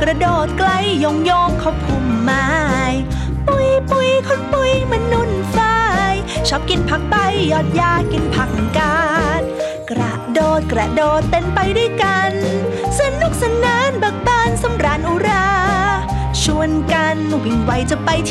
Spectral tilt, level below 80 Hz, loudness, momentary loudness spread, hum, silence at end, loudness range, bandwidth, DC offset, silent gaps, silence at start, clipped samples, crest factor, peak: -5 dB/octave; -28 dBFS; -16 LUFS; 4 LU; none; 0 s; 1 LU; 14 kHz; under 0.1%; none; 0 s; under 0.1%; 14 dB; -2 dBFS